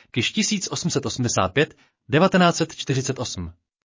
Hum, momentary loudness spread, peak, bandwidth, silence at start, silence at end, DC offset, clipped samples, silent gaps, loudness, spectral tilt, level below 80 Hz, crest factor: none; 10 LU; -6 dBFS; 7.6 kHz; 0.15 s; 0.4 s; under 0.1%; under 0.1%; none; -22 LUFS; -4.5 dB/octave; -48 dBFS; 16 dB